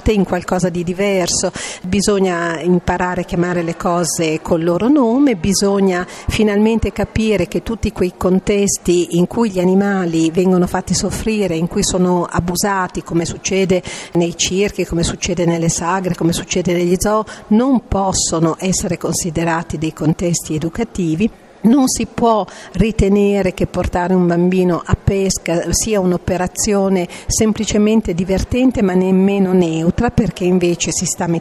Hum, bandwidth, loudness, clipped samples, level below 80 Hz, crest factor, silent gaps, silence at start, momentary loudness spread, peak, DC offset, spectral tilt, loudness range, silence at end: none; 13.5 kHz; -16 LUFS; under 0.1%; -32 dBFS; 12 dB; none; 0 s; 5 LU; -2 dBFS; under 0.1%; -5 dB/octave; 2 LU; 0 s